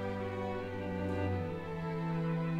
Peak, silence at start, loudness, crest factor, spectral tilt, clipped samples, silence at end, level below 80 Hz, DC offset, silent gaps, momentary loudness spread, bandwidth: -22 dBFS; 0 s; -37 LUFS; 12 dB; -8.5 dB/octave; under 0.1%; 0 s; -58 dBFS; under 0.1%; none; 4 LU; 7.8 kHz